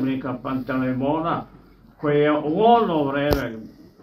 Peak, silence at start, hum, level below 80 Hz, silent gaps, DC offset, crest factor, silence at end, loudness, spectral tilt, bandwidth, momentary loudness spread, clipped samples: -2 dBFS; 0 s; none; -44 dBFS; none; under 0.1%; 20 dB; 0.3 s; -22 LUFS; -7.5 dB/octave; 15.5 kHz; 12 LU; under 0.1%